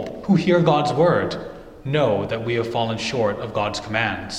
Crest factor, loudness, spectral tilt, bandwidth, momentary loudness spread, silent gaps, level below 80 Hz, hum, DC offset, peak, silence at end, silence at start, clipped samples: 18 dB; -21 LUFS; -6 dB/octave; 11 kHz; 8 LU; none; -48 dBFS; none; under 0.1%; -2 dBFS; 0 s; 0 s; under 0.1%